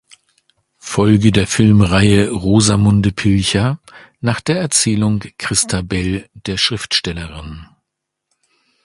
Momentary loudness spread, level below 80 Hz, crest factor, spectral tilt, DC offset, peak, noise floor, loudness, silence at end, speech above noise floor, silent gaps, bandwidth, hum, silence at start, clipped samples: 13 LU; -34 dBFS; 16 dB; -4.5 dB/octave; under 0.1%; 0 dBFS; -78 dBFS; -15 LUFS; 1.2 s; 63 dB; none; 11.5 kHz; none; 0.85 s; under 0.1%